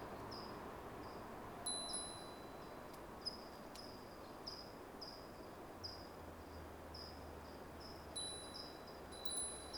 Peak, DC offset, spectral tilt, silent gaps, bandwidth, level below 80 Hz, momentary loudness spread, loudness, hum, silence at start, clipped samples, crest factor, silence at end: -28 dBFS; under 0.1%; -2.5 dB/octave; none; over 20 kHz; -64 dBFS; 11 LU; -49 LUFS; none; 0 s; under 0.1%; 22 dB; 0 s